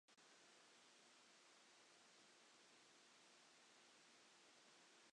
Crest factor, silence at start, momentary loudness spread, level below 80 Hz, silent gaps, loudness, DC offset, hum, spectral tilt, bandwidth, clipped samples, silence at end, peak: 14 dB; 0.1 s; 0 LU; under -90 dBFS; none; -69 LUFS; under 0.1%; none; -0.5 dB/octave; 10 kHz; under 0.1%; 0 s; -58 dBFS